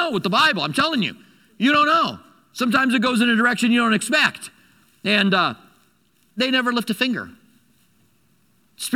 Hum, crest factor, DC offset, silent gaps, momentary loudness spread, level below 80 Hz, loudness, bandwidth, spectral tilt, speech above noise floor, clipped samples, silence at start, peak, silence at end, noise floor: none; 18 dB; under 0.1%; none; 17 LU; -64 dBFS; -19 LUFS; 16 kHz; -4 dB/octave; 43 dB; under 0.1%; 0 s; -4 dBFS; 0 s; -62 dBFS